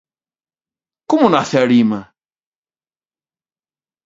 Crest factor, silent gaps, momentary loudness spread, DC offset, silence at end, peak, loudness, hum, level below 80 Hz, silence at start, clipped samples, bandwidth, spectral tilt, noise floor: 20 dB; none; 6 LU; under 0.1%; 2 s; 0 dBFS; -14 LUFS; none; -62 dBFS; 1.1 s; under 0.1%; 7.8 kHz; -6 dB/octave; under -90 dBFS